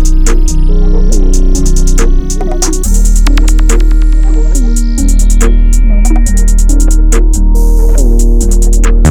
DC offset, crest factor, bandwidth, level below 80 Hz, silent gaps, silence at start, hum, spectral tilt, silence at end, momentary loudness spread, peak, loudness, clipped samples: 2%; 4 dB; 13 kHz; -4 dBFS; none; 0 s; none; -5.5 dB/octave; 0 s; 3 LU; 0 dBFS; -11 LUFS; under 0.1%